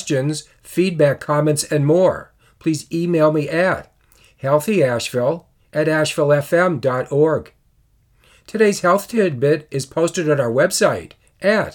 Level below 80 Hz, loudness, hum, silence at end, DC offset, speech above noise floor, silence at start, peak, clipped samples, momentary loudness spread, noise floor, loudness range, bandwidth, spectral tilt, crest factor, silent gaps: -56 dBFS; -18 LUFS; none; 0.05 s; under 0.1%; 41 dB; 0 s; -2 dBFS; under 0.1%; 9 LU; -58 dBFS; 2 LU; 18.5 kHz; -5.5 dB/octave; 16 dB; none